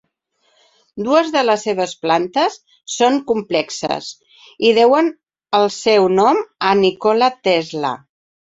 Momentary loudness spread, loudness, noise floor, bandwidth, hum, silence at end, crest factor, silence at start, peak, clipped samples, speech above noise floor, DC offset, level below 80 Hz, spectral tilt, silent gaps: 11 LU; -16 LUFS; -64 dBFS; 8 kHz; none; 0.5 s; 16 dB; 0.95 s; -2 dBFS; under 0.1%; 48 dB; under 0.1%; -62 dBFS; -4 dB/octave; none